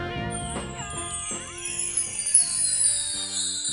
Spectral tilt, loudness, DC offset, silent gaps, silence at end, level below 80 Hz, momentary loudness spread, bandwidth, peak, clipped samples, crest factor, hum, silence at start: -1 dB/octave; -24 LUFS; under 0.1%; none; 0 s; -48 dBFS; 13 LU; 13 kHz; -4 dBFS; under 0.1%; 22 dB; none; 0 s